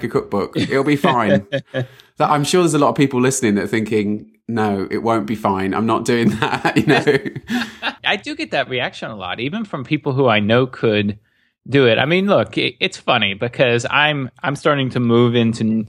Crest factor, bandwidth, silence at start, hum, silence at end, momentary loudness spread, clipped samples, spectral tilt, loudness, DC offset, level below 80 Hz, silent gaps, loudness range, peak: 16 dB; 15.5 kHz; 0 s; none; 0 s; 9 LU; under 0.1%; -5 dB/octave; -17 LUFS; under 0.1%; -56 dBFS; none; 3 LU; 0 dBFS